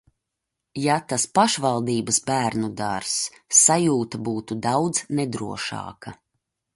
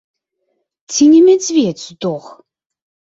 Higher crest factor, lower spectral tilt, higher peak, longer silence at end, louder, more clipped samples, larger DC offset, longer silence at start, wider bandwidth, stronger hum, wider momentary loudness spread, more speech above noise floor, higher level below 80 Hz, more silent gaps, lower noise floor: first, 22 dB vs 14 dB; about the same, -3.5 dB/octave vs -4.5 dB/octave; about the same, -2 dBFS vs -2 dBFS; second, 0.6 s vs 0.9 s; second, -22 LUFS vs -12 LUFS; neither; neither; second, 0.75 s vs 0.9 s; first, 11.5 kHz vs 7.8 kHz; neither; about the same, 13 LU vs 15 LU; about the same, 60 dB vs 57 dB; about the same, -60 dBFS vs -60 dBFS; neither; first, -83 dBFS vs -69 dBFS